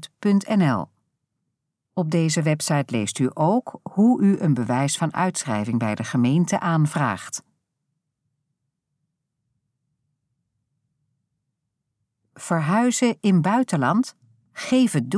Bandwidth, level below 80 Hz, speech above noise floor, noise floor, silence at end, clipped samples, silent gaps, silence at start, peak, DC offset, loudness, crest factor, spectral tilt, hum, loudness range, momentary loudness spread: 11 kHz; -72 dBFS; 59 dB; -79 dBFS; 0 s; under 0.1%; none; 0 s; -8 dBFS; under 0.1%; -22 LUFS; 16 dB; -5.5 dB/octave; none; 7 LU; 10 LU